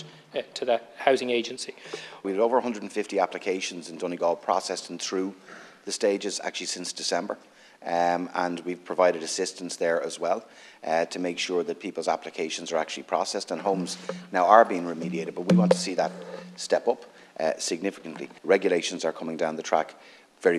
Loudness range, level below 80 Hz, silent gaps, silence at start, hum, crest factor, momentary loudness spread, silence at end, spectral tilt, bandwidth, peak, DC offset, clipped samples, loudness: 5 LU; -82 dBFS; none; 0 s; none; 26 dB; 12 LU; 0 s; -4 dB/octave; 13 kHz; -2 dBFS; under 0.1%; under 0.1%; -27 LUFS